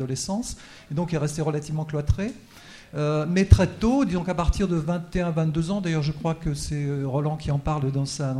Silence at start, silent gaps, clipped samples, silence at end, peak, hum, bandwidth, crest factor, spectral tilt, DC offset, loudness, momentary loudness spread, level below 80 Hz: 0 s; none; under 0.1%; 0 s; 0 dBFS; none; 13 kHz; 24 dB; -6.5 dB/octave; under 0.1%; -25 LUFS; 9 LU; -32 dBFS